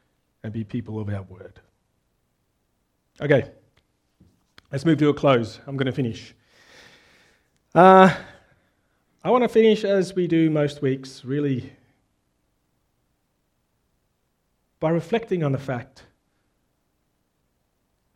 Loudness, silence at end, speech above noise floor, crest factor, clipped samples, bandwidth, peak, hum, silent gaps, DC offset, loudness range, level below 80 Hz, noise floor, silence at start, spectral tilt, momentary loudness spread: -21 LUFS; 2.3 s; 51 dB; 24 dB; under 0.1%; 12 kHz; 0 dBFS; 60 Hz at -55 dBFS; none; under 0.1%; 13 LU; -62 dBFS; -71 dBFS; 0.45 s; -7.5 dB/octave; 17 LU